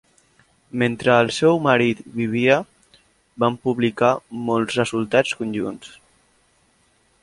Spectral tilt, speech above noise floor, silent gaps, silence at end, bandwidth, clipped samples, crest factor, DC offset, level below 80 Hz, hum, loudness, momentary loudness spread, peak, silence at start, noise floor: -5.5 dB/octave; 42 dB; none; 1.35 s; 11.5 kHz; under 0.1%; 20 dB; under 0.1%; -58 dBFS; none; -20 LUFS; 9 LU; -2 dBFS; 0.75 s; -61 dBFS